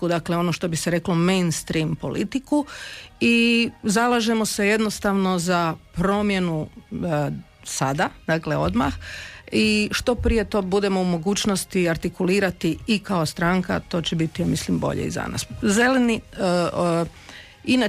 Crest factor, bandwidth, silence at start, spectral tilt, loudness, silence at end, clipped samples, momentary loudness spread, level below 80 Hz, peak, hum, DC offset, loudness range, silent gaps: 14 dB; 15.5 kHz; 0 s; -5 dB/octave; -22 LUFS; 0 s; under 0.1%; 8 LU; -42 dBFS; -8 dBFS; none; under 0.1%; 3 LU; none